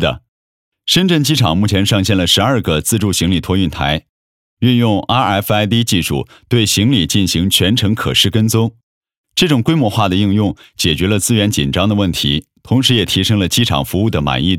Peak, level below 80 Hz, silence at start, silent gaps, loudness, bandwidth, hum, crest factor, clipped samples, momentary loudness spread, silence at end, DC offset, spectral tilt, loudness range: 0 dBFS; -36 dBFS; 0 s; 0.29-0.72 s, 4.09-4.57 s, 8.83-9.01 s, 9.17-9.24 s; -14 LUFS; 17 kHz; none; 14 dB; under 0.1%; 6 LU; 0 s; under 0.1%; -4.5 dB/octave; 2 LU